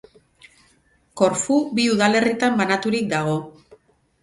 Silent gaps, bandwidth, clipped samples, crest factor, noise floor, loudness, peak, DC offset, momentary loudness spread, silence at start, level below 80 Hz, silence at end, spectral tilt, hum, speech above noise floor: none; 11.5 kHz; under 0.1%; 20 dB; -60 dBFS; -20 LUFS; -2 dBFS; under 0.1%; 7 LU; 1.15 s; -60 dBFS; 0.7 s; -4.5 dB/octave; none; 41 dB